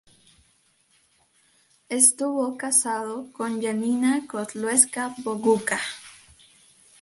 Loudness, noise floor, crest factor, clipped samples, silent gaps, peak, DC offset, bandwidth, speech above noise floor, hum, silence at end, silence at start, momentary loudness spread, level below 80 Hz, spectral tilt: -23 LUFS; -64 dBFS; 24 dB; under 0.1%; none; -2 dBFS; under 0.1%; 12 kHz; 40 dB; none; 0.85 s; 1.9 s; 14 LU; -70 dBFS; -2.5 dB/octave